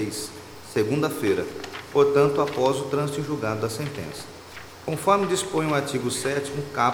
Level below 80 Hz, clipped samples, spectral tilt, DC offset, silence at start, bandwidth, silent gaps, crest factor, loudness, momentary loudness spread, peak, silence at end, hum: -58 dBFS; under 0.1%; -5 dB/octave; under 0.1%; 0 s; 19.5 kHz; none; 20 dB; -24 LUFS; 15 LU; -6 dBFS; 0 s; none